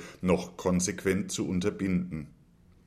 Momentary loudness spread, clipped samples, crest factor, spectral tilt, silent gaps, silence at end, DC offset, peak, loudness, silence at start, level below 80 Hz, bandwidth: 9 LU; under 0.1%; 18 dB; -5.5 dB/octave; none; 0.55 s; under 0.1%; -12 dBFS; -30 LUFS; 0 s; -56 dBFS; 14.5 kHz